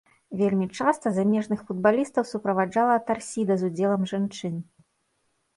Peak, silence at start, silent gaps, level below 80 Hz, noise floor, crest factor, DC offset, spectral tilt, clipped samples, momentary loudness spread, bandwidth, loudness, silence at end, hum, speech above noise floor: -8 dBFS; 0.3 s; none; -68 dBFS; -72 dBFS; 18 dB; under 0.1%; -6.5 dB/octave; under 0.1%; 7 LU; 11.5 kHz; -25 LUFS; 0.95 s; none; 48 dB